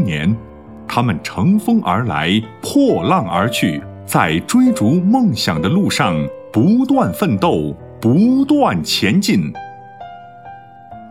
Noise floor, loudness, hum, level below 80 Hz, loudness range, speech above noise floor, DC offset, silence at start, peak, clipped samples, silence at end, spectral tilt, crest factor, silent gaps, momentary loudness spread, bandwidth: -37 dBFS; -15 LUFS; none; -46 dBFS; 2 LU; 22 dB; 0.2%; 0 s; 0 dBFS; under 0.1%; 0 s; -6 dB/octave; 16 dB; none; 13 LU; 16 kHz